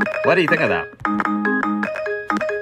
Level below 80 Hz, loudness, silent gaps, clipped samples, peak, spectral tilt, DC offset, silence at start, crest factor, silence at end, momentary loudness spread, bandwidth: -56 dBFS; -19 LUFS; none; under 0.1%; -2 dBFS; -6.5 dB/octave; under 0.1%; 0 s; 18 dB; 0 s; 8 LU; 13.5 kHz